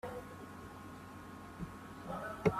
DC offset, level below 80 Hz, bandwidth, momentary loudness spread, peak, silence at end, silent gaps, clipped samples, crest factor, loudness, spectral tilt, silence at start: under 0.1%; -62 dBFS; 15 kHz; 7 LU; -16 dBFS; 0 s; none; under 0.1%; 26 dB; -46 LUFS; -7 dB/octave; 0.05 s